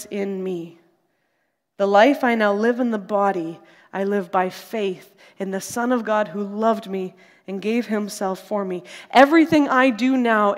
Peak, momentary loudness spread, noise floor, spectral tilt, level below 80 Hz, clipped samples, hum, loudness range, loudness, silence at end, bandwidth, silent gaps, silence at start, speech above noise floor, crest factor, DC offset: 0 dBFS; 14 LU; -72 dBFS; -5 dB/octave; -66 dBFS; under 0.1%; none; 5 LU; -20 LUFS; 0 s; 16 kHz; none; 0 s; 52 dB; 20 dB; under 0.1%